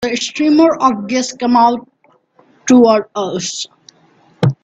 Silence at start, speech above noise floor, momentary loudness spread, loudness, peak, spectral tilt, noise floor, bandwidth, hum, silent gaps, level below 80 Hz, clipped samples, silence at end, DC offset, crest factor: 0 s; 40 dB; 14 LU; -14 LUFS; 0 dBFS; -5 dB/octave; -52 dBFS; 8.4 kHz; none; none; -56 dBFS; under 0.1%; 0.1 s; under 0.1%; 14 dB